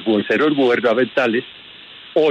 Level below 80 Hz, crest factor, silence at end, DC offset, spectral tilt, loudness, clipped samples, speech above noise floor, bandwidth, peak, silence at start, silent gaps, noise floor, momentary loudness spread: -66 dBFS; 12 dB; 0 s; under 0.1%; -6.5 dB/octave; -17 LUFS; under 0.1%; 23 dB; 8.4 kHz; -4 dBFS; 0 s; none; -40 dBFS; 22 LU